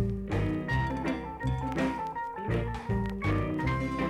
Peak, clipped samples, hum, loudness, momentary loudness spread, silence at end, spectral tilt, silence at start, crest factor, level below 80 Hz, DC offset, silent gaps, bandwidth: -16 dBFS; under 0.1%; none; -32 LUFS; 4 LU; 0 s; -7.5 dB/octave; 0 s; 14 dB; -40 dBFS; under 0.1%; none; 12 kHz